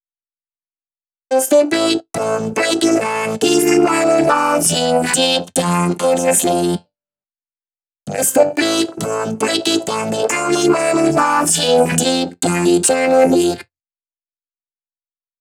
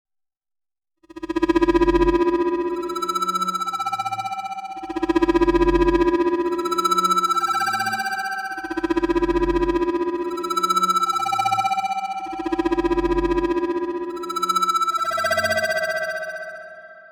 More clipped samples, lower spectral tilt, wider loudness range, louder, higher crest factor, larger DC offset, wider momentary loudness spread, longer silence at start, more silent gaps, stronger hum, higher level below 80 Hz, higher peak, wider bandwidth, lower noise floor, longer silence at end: neither; about the same, -3.5 dB/octave vs -4.5 dB/octave; about the same, 4 LU vs 3 LU; first, -15 LUFS vs -21 LUFS; about the same, 16 dB vs 14 dB; neither; second, 7 LU vs 10 LU; first, 1.3 s vs 1.15 s; neither; neither; second, -54 dBFS vs -38 dBFS; first, 0 dBFS vs -8 dBFS; about the same, 19.5 kHz vs over 20 kHz; about the same, under -90 dBFS vs -90 dBFS; first, 1.8 s vs 0.05 s